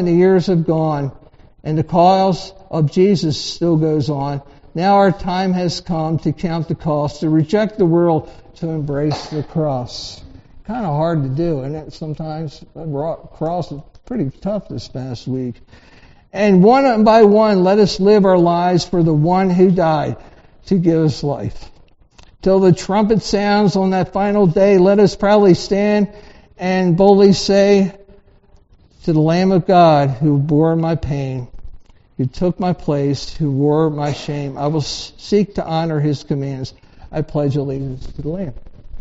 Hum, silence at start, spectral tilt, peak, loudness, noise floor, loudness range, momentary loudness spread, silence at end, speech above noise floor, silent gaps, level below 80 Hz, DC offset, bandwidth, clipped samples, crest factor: none; 0 s; -6.5 dB/octave; 0 dBFS; -16 LUFS; -49 dBFS; 9 LU; 15 LU; 0 s; 34 dB; none; -40 dBFS; under 0.1%; 8 kHz; under 0.1%; 16 dB